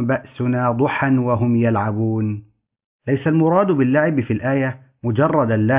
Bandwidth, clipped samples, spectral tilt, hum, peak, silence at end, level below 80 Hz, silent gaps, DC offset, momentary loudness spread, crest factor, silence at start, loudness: 3.8 kHz; under 0.1%; -12.5 dB/octave; none; -4 dBFS; 0 s; -50 dBFS; 2.85-2.99 s; under 0.1%; 7 LU; 14 dB; 0 s; -19 LUFS